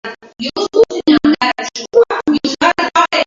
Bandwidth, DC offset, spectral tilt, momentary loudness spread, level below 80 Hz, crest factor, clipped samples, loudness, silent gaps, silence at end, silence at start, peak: 7.6 kHz; under 0.1%; -3.5 dB/octave; 10 LU; -50 dBFS; 14 dB; under 0.1%; -13 LUFS; none; 0 s; 0.05 s; 0 dBFS